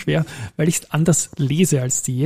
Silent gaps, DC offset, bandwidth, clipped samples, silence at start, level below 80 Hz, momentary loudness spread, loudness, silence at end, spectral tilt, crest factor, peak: none; under 0.1%; 15.5 kHz; under 0.1%; 0 s; -50 dBFS; 5 LU; -19 LUFS; 0 s; -5 dB/octave; 14 dB; -4 dBFS